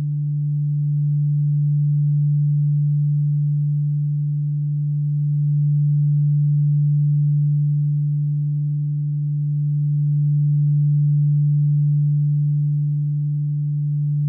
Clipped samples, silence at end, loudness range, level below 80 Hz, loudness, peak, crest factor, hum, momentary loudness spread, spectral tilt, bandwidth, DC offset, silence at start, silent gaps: under 0.1%; 0 s; 2 LU; -74 dBFS; -20 LUFS; -14 dBFS; 6 dB; none; 5 LU; -15.5 dB/octave; 0.3 kHz; under 0.1%; 0 s; none